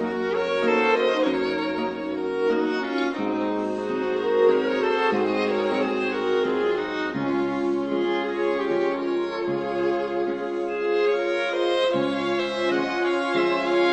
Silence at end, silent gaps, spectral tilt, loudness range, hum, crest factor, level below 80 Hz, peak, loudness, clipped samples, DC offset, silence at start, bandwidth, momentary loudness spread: 0 s; none; -5.5 dB/octave; 2 LU; none; 16 dB; -60 dBFS; -8 dBFS; -24 LUFS; under 0.1%; under 0.1%; 0 s; 8.8 kHz; 6 LU